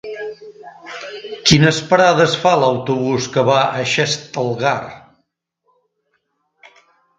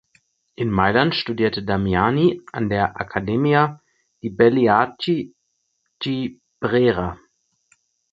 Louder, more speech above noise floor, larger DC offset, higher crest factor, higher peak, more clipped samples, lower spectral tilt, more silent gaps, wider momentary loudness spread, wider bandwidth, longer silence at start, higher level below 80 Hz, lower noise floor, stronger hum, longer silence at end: first, -15 LUFS vs -20 LUFS; about the same, 54 dB vs 53 dB; neither; about the same, 18 dB vs 20 dB; about the same, 0 dBFS vs 0 dBFS; neither; second, -4.5 dB/octave vs -8 dB/octave; neither; first, 19 LU vs 11 LU; first, 9.4 kHz vs 7.6 kHz; second, 0.05 s vs 0.6 s; about the same, -50 dBFS vs -46 dBFS; about the same, -69 dBFS vs -72 dBFS; neither; first, 2.2 s vs 1 s